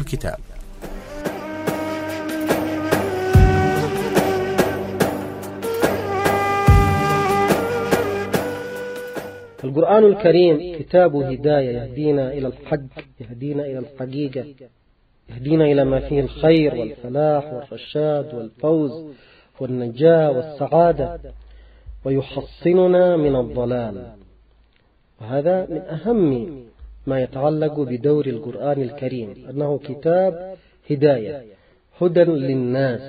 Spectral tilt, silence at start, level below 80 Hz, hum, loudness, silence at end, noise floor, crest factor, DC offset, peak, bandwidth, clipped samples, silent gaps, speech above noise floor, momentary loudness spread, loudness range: -7 dB/octave; 0 s; -34 dBFS; none; -19 LUFS; 0 s; -58 dBFS; 18 dB; under 0.1%; -2 dBFS; 16 kHz; under 0.1%; none; 39 dB; 16 LU; 6 LU